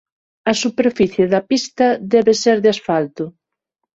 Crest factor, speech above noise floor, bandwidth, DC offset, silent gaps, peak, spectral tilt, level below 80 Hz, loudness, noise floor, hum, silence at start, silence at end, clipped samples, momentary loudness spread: 16 dB; 62 dB; 8 kHz; under 0.1%; none; -2 dBFS; -4.5 dB/octave; -56 dBFS; -16 LUFS; -78 dBFS; none; 0.45 s; 0.65 s; under 0.1%; 10 LU